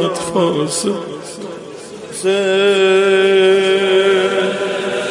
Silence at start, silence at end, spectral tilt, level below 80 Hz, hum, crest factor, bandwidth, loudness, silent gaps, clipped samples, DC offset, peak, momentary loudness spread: 0 s; 0 s; -4 dB/octave; -60 dBFS; none; 12 dB; 11.5 kHz; -14 LUFS; none; under 0.1%; under 0.1%; -2 dBFS; 17 LU